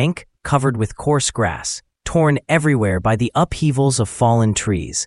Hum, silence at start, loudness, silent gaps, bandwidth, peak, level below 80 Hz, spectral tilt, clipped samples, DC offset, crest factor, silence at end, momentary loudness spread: none; 0 s; -18 LUFS; none; 11.5 kHz; -2 dBFS; -40 dBFS; -5 dB/octave; under 0.1%; under 0.1%; 16 dB; 0 s; 6 LU